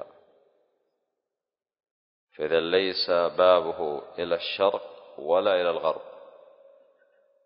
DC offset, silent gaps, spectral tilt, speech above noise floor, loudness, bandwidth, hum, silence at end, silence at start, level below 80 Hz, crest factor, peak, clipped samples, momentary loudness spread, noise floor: under 0.1%; 1.91-2.27 s; -8 dB/octave; 65 dB; -25 LUFS; 5.4 kHz; none; 1.2 s; 0 s; -66 dBFS; 20 dB; -8 dBFS; under 0.1%; 16 LU; -90 dBFS